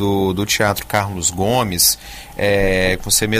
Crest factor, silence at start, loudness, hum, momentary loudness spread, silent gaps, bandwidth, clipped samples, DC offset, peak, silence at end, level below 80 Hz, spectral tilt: 16 dB; 0 s; -16 LUFS; none; 7 LU; none; 16 kHz; under 0.1%; under 0.1%; -2 dBFS; 0 s; -34 dBFS; -3 dB/octave